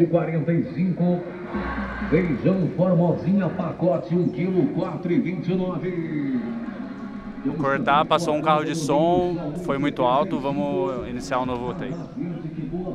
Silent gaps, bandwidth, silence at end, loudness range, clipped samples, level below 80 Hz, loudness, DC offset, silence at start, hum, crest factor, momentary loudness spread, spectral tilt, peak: none; 11.5 kHz; 0 s; 4 LU; under 0.1%; -46 dBFS; -24 LUFS; under 0.1%; 0 s; none; 18 dB; 11 LU; -7.5 dB/octave; -4 dBFS